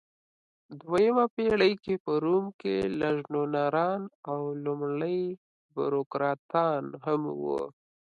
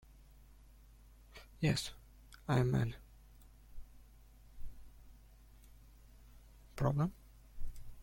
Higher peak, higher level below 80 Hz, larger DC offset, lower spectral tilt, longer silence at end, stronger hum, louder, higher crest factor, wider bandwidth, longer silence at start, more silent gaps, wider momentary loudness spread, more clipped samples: first, -12 dBFS vs -18 dBFS; second, -64 dBFS vs -54 dBFS; neither; about the same, -7.5 dB/octave vs -6.5 dB/octave; first, 0.4 s vs 0 s; neither; first, -29 LUFS vs -37 LUFS; about the same, 18 dB vs 22 dB; second, 10.5 kHz vs 16.5 kHz; first, 0.7 s vs 0.1 s; first, 1.30-1.37 s, 2.00-2.05 s, 2.54-2.59 s, 4.15-4.23 s, 5.38-5.69 s, 6.06-6.10 s, 6.39-6.49 s vs none; second, 10 LU vs 26 LU; neither